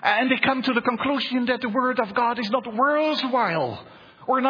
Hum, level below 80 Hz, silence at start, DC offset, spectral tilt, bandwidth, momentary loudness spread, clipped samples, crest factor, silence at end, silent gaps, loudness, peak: none; -64 dBFS; 0 s; under 0.1%; -6 dB/octave; 5.2 kHz; 5 LU; under 0.1%; 20 dB; 0 s; none; -23 LUFS; -4 dBFS